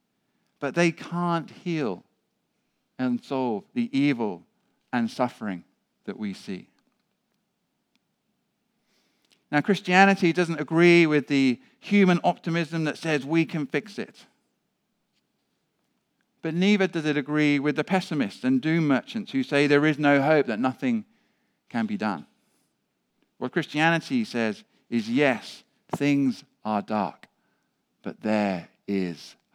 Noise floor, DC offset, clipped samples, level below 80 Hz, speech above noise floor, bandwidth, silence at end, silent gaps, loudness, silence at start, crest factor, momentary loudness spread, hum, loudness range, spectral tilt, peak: -76 dBFS; under 0.1%; under 0.1%; -82 dBFS; 52 dB; 12.5 kHz; 0.25 s; none; -25 LUFS; 0.6 s; 24 dB; 15 LU; none; 11 LU; -6.5 dB/octave; -2 dBFS